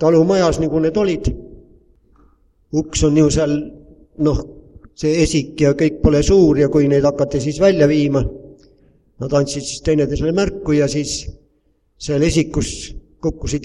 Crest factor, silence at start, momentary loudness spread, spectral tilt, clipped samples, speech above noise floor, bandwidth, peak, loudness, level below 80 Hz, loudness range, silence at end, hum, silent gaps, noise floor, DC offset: 16 dB; 0 s; 12 LU; -6 dB/octave; under 0.1%; 45 dB; 11 kHz; 0 dBFS; -17 LUFS; -32 dBFS; 5 LU; 0 s; none; none; -61 dBFS; under 0.1%